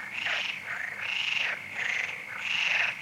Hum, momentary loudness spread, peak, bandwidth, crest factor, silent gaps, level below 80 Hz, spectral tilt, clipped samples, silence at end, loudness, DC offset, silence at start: none; 8 LU; -12 dBFS; 16 kHz; 18 dB; none; -78 dBFS; 0 dB/octave; under 0.1%; 0 s; -29 LUFS; under 0.1%; 0 s